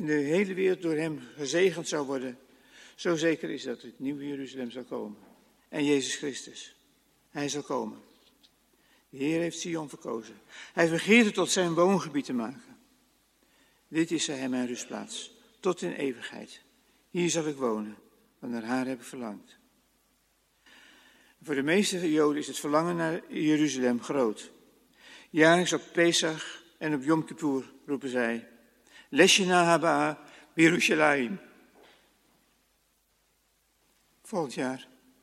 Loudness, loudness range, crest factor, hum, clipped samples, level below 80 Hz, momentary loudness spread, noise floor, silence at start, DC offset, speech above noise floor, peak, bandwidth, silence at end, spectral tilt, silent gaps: -28 LUFS; 10 LU; 24 dB; none; under 0.1%; -76 dBFS; 17 LU; -71 dBFS; 0 s; under 0.1%; 43 dB; -6 dBFS; 14.5 kHz; 0.4 s; -4 dB/octave; none